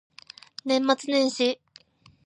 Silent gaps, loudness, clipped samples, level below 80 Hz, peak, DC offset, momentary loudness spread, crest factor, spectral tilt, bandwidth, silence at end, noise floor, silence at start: none; -24 LUFS; under 0.1%; -78 dBFS; -6 dBFS; under 0.1%; 21 LU; 22 dB; -2.5 dB/octave; 10.5 kHz; 0.7 s; -56 dBFS; 0.65 s